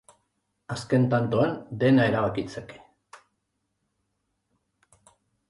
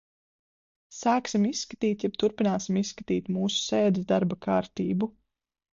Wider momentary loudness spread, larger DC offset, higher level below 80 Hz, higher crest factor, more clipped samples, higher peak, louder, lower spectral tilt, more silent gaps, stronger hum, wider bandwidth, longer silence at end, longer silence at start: first, 16 LU vs 5 LU; neither; about the same, -60 dBFS vs -64 dBFS; about the same, 18 dB vs 16 dB; neither; about the same, -10 dBFS vs -12 dBFS; first, -24 LUFS vs -27 LUFS; first, -7.5 dB/octave vs -5.5 dB/octave; neither; neither; first, 11.5 kHz vs 7.6 kHz; first, 2.75 s vs 0.65 s; second, 0.7 s vs 0.9 s